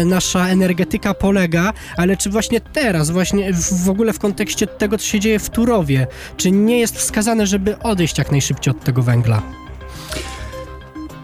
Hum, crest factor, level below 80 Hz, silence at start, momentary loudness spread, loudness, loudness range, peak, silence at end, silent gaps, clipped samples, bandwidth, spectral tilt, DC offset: none; 14 dB; -34 dBFS; 0 s; 13 LU; -17 LUFS; 2 LU; -2 dBFS; 0 s; none; under 0.1%; 16 kHz; -5 dB/octave; under 0.1%